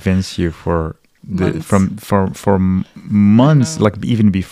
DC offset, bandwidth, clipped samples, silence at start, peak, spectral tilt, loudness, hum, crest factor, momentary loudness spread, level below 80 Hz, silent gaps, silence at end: under 0.1%; 14.5 kHz; under 0.1%; 0 s; 0 dBFS; -7 dB/octave; -15 LUFS; none; 14 dB; 10 LU; -38 dBFS; none; 0.05 s